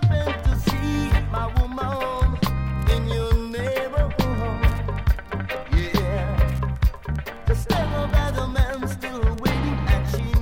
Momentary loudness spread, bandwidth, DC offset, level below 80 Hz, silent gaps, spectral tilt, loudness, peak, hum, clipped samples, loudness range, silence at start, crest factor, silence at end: 3 LU; 17 kHz; under 0.1%; -24 dBFS; none; -6.5 dB/octave; -24 LUFS; -6 dBFS; none; under 0.1%; 1 LU; 0 s; 16 dB; 0 s